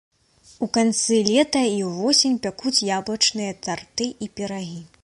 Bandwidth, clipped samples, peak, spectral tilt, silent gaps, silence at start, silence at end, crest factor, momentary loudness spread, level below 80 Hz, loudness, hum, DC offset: 11.5 kHz; under 0.1%; -2 dBFS; -3 dB/octave; none; 0.6 s; 0.15 s; 20 dB; 12 LU; -60 dBFS; -21 LUFS; none; under 0.1%